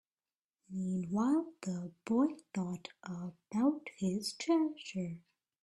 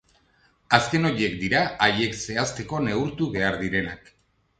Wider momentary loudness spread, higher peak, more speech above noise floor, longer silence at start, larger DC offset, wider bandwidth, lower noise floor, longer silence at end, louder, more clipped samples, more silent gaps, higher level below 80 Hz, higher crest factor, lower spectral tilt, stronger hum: first, 12 LU vs 7 LU; second, -20 dBFS vs 0 dBFS; first, over 55 dB vs 39 dB; about the same, 0.7 s vs 0.7 s; neither; first, 13 kHz vs 9.4 kHz; first, under -90 dBFS vs -63 dBFS; second, 0.45 s vs 0.6 s; second, -36 LUFS vs -24 LUFS; neither; neither; second, -76 dBFS vs -50 dBFS; second, 16 dB vs 24 dB; first, -6 dB/octave vs -4.5 dB/octave; neither